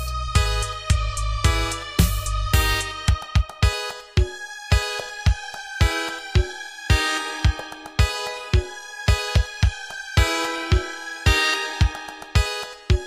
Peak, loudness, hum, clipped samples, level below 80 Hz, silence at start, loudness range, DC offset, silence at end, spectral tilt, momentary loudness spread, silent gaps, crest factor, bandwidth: -4 dBFS; -23 LUFS; none; under 0.1%; -26 dBFS; 0 s; 2 LU; under 0.1%; 0 s; -4 dB/octave; 8 LU; none; 18 dB; 16 kHz